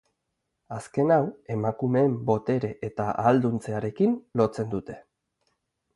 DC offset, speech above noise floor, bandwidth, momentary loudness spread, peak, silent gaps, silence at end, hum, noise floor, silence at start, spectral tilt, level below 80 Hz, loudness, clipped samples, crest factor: under 0.1%; 55 dB; 11.5 kHz; 11 LU; -6 dBFS; none; 0.95 s; none; -80 dBFS; 0.7 s; -8.5 dB/octave; -60 dBFS; -26 LUFS; under 0.1%; 20 dB